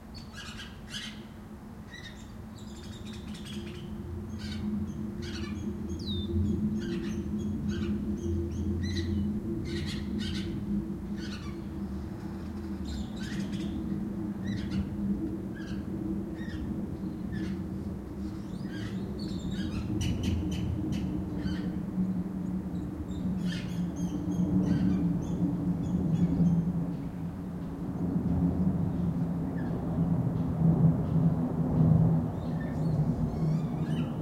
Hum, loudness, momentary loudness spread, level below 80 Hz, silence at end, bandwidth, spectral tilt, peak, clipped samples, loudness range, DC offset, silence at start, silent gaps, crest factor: none; -32 LUFS; 12 LU; -46 dBFS; 0 s; 12.5 kHz; -7.5 dB/octave; -12 dBFS; under 0.1%; 9 LU; under 0.1%; 0 s; none; 18 dB